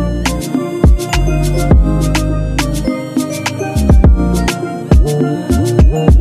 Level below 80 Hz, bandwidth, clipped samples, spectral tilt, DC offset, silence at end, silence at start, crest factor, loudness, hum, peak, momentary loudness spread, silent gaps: -14 dBFS; 15 kHz; under 0.1%; -6.5 dB/octave; under 0.1%; 0 s; 0 s; 12 dB; -13 LUFS; none; 0 dBFS; 8 LU; none